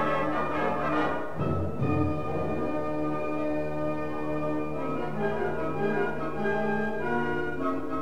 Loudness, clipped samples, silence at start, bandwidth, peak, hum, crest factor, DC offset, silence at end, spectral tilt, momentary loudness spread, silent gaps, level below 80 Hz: -30 LUFS; under 0.1%; 0 s; 13.5 kHz; -12 dBFS; none; 16 dB; 2%; 0 s; -8 dB/octave; 4 LU; none; -52 dBFS